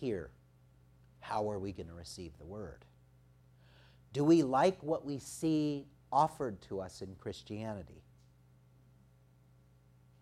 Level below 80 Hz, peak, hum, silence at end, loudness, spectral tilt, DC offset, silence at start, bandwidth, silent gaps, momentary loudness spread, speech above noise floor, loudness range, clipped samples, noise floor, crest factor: -66 dBFS; -16 dBFS; none; 2.2 s; -35 LUFS; -6.5 dB/octave; under 0.1%; 0 s; 13 kHz; none; 19 LU; 30 dB; 14 LU; under 0.1%; -65 dBFS; 20 dB